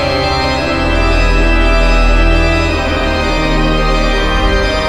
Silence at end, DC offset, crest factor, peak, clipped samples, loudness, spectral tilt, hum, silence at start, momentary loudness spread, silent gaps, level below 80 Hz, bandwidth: 0 s; 1%; 10 dB; 0 dBFS; under 0.1%; -13 LUFS; -5.5 dB/octave; none; 0 s; 2 LU; none; -14 dBFS; 10.5 kHz